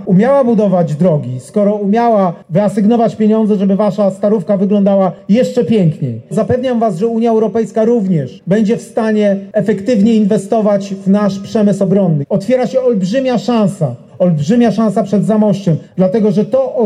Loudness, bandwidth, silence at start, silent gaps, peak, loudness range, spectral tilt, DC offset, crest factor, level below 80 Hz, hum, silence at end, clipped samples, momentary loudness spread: -13 LUFS; 11 kHz; 0 s; none; -2 dBFS; 1 LU; -8 dB/octave; under 0.1%; 10 dB; -56 dBFS; none; 0 s; under 0.1%; 5 LU